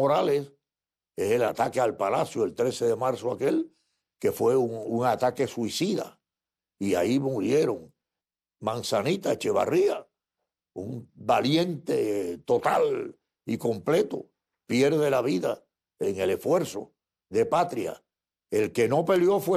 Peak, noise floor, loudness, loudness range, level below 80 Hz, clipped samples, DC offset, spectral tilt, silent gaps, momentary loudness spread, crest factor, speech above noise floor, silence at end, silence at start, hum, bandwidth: -10 dBFS; under -90 dBFS; -26 LUFS; 2 LU; -68 dBFS; under 0.1%; under 0.1%; -5.5 dB/octave; none; 13 LU; 16 dB; over 65 dB; 0 s; 0 s; none; 14.5 kHz